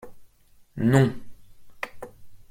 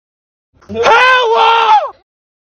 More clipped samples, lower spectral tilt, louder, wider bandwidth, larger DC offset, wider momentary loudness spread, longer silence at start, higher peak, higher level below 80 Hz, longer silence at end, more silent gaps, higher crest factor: neither; first, -7.5 dB/octave vs -2 dB/octave; second, -24 LUFS vs -9 LUFS; first, 15.5 kHz vs 10.5 kHz; neither; first, 24 LU vs 14 LU; second, 0.05 s vs 0.7 s; second, -4 dBFS vs 0 dBFS; about the same, -54 dBFS vs -50 dBFS; second, 0.1 s vs 0.6 s; neither; first, 24 dB vs 12 dB